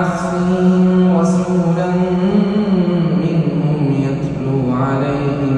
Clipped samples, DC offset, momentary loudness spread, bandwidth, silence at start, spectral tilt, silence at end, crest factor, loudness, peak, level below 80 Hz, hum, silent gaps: under 0.1%; under 0.1%; 5 LU; 9.4 kHz; 0 s; -8.5 dB/octave; 0 s; 12 dB; -15 LUFS; -2 dBFS; -42 dBFS; none; none